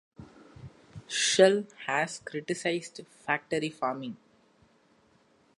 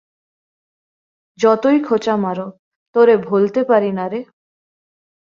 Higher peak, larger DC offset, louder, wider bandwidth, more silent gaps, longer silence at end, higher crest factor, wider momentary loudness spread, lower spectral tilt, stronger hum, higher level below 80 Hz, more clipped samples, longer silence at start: second, -6 dBFS vs -2 dBFS; neither; second, -28 LUFS vs -16 LUFS; first, 11.5 kHz vs 7.4 kHz; second, none vs 2.59-2.94 s; first, 1.4 s vs 1 s; first, 24 dB vs 16 dB; first, 28 LU vs 12 LU; second, -3 dB/octave vs -7 dB/octave; neither; about the same, -68 dBFS vs -64 dBFS; neither; second, 0.2 s vs 1.4 s